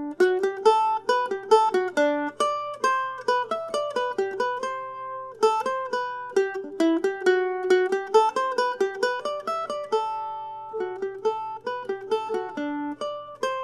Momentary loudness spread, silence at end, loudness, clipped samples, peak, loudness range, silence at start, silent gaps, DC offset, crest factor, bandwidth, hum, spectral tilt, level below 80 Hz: 11 LU; 0 s; -25 LUFS; under 0.1%; -6 dBFS; 6 LU; 0 s; none; under 0.1%; 20 dB; 12.5 kHz; none; -3 dB/octave; -74 dBFS